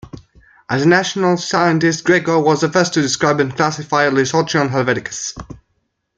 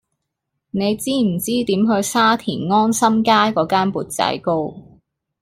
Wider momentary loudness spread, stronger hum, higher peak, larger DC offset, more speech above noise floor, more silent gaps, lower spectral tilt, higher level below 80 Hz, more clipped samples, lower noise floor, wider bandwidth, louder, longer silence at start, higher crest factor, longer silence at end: about the same, 7 LU vs 7 LU; neither; about the same, 0 dBFS vs -2 dBFS; neither; second, 53 dB vs 60 dB; neither; about the same, -4.5 dB/octave vs -4.5 dB/octave; about the same, -50 dBFS vs -54 dBFS; neither; second, -68 dBFS vs -77 dBFS; second, 9.4 kHz vs 16 kHz; about the same, -16 LUFS vs -18 LUFS; second, 0.05 s vs 0.75 s; about the same, 16 dB vs 16 dB; about the same, 0.6 s vs 0.6 s